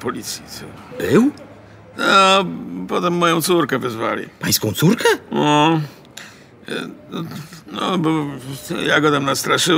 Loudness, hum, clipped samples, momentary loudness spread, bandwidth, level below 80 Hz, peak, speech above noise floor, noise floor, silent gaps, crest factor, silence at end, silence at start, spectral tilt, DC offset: -17 LUFS; none; under 0.1%; 17 LU; 16 kHz; -56 dBFS; -2 dBFS; 23 dB; -41 dBFS; none; 16 dB; 0 s; 0 s; -4 dB/octave; under 0.1%